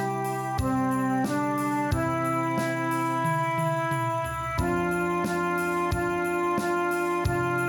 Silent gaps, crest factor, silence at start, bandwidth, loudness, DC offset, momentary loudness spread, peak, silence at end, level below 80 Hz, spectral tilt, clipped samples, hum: none; 14 dB; 0 s; 19.5 kHz; -27 LUFS; under 0.1%; 2 LU; -12 dBFS; 0 s; -44 dBFS; -6 dB/octave; under 0.1%; none